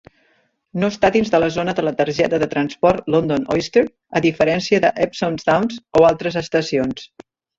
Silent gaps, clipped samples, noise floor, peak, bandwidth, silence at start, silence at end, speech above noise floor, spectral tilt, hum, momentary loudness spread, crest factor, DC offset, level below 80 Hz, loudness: none; under 0.1%; -62 dBFS; -2 dBFS; 7.8 kHz; 0.75 s; 0.55 s; 44 dB; -6 dB/octave; none; 6 LU; 16 dB; under 0.1%; -48 dBFS; -18 LUFS